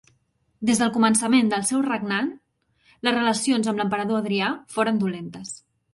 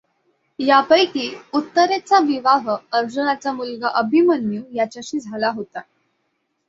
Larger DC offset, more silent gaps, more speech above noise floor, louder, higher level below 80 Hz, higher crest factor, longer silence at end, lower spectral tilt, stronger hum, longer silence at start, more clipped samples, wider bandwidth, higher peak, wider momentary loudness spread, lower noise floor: neither; neither; second, 44 dB vs 52 dB; second, -22 LUFS vs -19 LUFS; about the same, -66 dBFS vs -66 dBFS; about the same, 16 dB vs 18 dB; second, 0.35 s vs 0.85 s; about the same, -4 dB/octave vs -4.5 dB/octave; neither; about the same, 0.6 s vs 0.6 s; neither; first, 11.5 kHz vs 7.8 kHz; second, -6 dBFS vs -2 dBFS; about the same, 12 LU vs 10 LU; second, -67 dBFS vs -71 dBFS